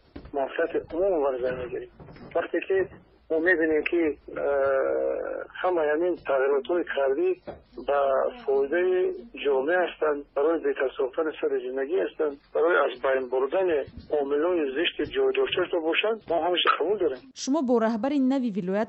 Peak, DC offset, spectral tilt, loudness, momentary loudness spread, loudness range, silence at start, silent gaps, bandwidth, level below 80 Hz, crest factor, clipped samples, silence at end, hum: -8 dBFS; under 0.1%; -5 dB/octave; -26 LUFS; 7 LU; 2 LU; 0.15 s; none; 8.2 kHz; -58 dBFS; 16 dB; under 0.1%; 0 s; none